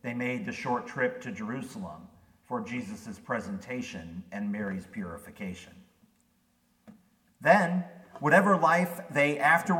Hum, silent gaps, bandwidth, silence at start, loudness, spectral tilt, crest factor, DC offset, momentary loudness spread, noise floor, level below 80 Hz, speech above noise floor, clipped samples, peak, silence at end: none; none; 17 kHz; 0.05 s; -28 LUFS; -6 dB/octave; 22 dB; under 0.1%; 18 LU; -70 dBFS; -68 dBFS; 41 dB; under 0.1%; -8 dBFS; 0 s